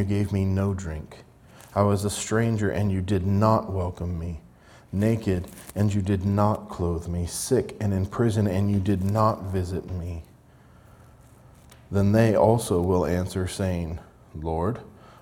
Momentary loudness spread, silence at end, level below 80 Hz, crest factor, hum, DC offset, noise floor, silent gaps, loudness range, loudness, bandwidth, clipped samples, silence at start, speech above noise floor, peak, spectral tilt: 13 LU; 0.15 s; -48 dBFS; 20 dB; none; under 0.1%; -53 dBFS; none; 2 LU; -25 LUFS; 16 kHz; under 0.1%; 0 s; 29 dB; -6 dBFS; -7 dB/octave